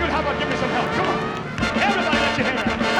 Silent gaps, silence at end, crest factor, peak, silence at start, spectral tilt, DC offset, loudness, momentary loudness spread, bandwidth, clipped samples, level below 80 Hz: none; 0 s; 14 dB; -6 dBFS; 0 s; -4.5 dB/octave; under 0.1%; -21 LUFS; 5 LU; 12 kHz; under 0.1%; -40 dBFS